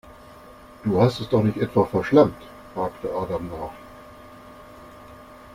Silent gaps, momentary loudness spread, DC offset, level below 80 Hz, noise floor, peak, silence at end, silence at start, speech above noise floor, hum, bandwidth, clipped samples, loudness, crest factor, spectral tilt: none; 26 LU; under 0.1%; -50 dBFS; -46 dBFS; -2 dBFS; 0 s; 0.3 s; 24 dB; none; 16 kHz; under 0.1%; -22 LUFS; 22 dB; -8 dB/octave